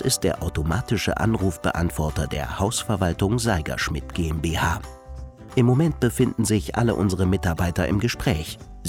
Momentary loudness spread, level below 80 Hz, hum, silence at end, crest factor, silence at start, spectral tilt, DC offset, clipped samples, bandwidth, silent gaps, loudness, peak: 6 LU; -36 dBFS; none; 0 s; 16 dB; 0 s; -5.5 dB/octave; under 0.1%; under 0.1%; 17 kHz; none; -23 LUFS; -6 dBFS